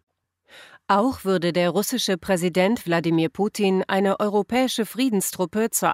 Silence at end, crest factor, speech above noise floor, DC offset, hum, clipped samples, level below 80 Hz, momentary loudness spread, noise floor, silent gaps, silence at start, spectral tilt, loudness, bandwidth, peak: 0 s; 16 dB; 33 dB; under 0.1%; none; under 0.1%; -60 dBFS; 3 LU; -55 dBFS; none; 0.55 s; -4.5 dB/octave; -22 LUFS; 16 kHz; -6 dBFS